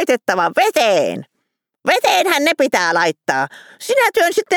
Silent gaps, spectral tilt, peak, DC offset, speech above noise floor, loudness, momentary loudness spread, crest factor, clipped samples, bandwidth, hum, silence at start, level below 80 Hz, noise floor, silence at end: none; -2.5 dB/octave; 0 dBFS; under 0.1%; 57 dB; -15 LUFS; 9 LU; 16 dB; under 0.1%; over 20 kHz; none; 0 s; -62 dBFS; -73 dBFS; 0 s